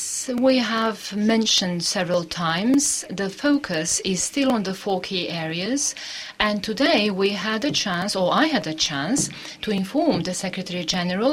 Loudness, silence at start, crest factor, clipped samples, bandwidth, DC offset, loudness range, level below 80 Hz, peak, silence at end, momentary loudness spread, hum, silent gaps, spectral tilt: -22 LUFS; 0 s; 18 dB; under 0.1%; 16 kHz; under 0.1%; 2 LU; -56 dBFS; -4 dBFS; 0 s; 7 LU; none; none; -3 dB/octave